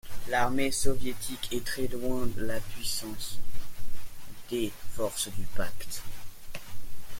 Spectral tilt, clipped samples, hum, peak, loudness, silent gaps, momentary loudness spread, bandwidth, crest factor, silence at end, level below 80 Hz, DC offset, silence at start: -3.5 dB/octave; under 0.1%; none; -8 dBFS; -33 LUFS; none; 18 LU; 17 kHz; 16 dB; 0 s; -42 dBFS; under 0.1%; 0.05 s